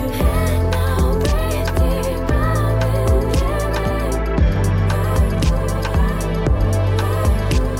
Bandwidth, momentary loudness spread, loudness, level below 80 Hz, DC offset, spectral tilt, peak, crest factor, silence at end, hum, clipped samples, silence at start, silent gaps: 16.5 kHz; 3 LU; -19 LUFS; -20 dBFS; under 0.1%; -6.5 dB/octave; -6 dBFS; 12 dB; 0 s; none; under 0.1%; 0 s; none